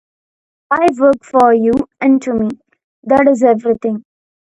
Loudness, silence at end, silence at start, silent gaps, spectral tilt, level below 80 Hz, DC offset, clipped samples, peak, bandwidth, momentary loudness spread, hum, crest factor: -13 LUFS; 0.5 s; 0.7 s; 2.84-3.03 s; -7 dB/octave; -50 dBFS; under 0.1%; under 0.1%; 0 dBFS; 10.5 kHz; 11 LU; none; 14 dB